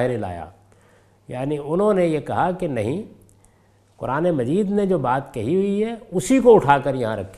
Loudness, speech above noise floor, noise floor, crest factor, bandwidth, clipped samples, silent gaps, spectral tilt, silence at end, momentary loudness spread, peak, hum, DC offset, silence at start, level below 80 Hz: -20 LUFS; 37 dB; -57 dBFS; 20 dB; 14 kHz; under 0.1%; none; -7 dB/octave; 0 s; 16 LU; 0 dBFS; none; under 0.1%; 0 s; -50 dBFS